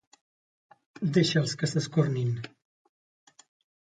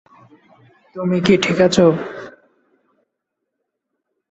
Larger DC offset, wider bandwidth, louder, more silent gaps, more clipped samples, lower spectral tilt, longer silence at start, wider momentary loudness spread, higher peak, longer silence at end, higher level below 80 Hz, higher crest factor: neither; first, 9.4 kHz vs 8.4 kHz; second, -28 LUFS vs -16 LUFS; neither; neither; about the same, -5.5 dB/octave vs -5.5 dB/octave; about the same, 1 s vs 0.95 s; second, 11 LU vs 23 LU; second, -10 dBFS vs -2 dBFS; second, 1.35 s vs 2.05 s; second, -68 dBFS vs -54 dBFS; about the same, 20 dB vs 18 dB